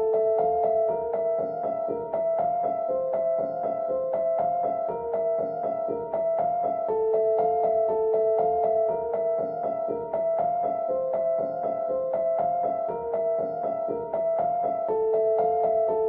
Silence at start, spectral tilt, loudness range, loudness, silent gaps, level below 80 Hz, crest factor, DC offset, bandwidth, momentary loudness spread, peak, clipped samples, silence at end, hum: 0 s; -10.5 dB/octave; 3 LU; -26 LUFS; none; -62 dBFS; 12 dB; under 0.1%; 2.8 kHz; 5 LU; -14 dBFS; under 0.1%; 0 s; none